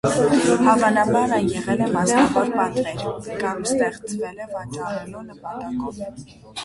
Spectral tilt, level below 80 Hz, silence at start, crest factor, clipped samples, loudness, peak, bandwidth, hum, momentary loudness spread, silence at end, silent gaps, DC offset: -5 dB/octave; -50 dBFS; 0.05 s; 18 dB; under 0.1%; -21 LUFS; -4 dBFS; 11.5 kHz; none; 16 LU; 0 s; none; under 0.1%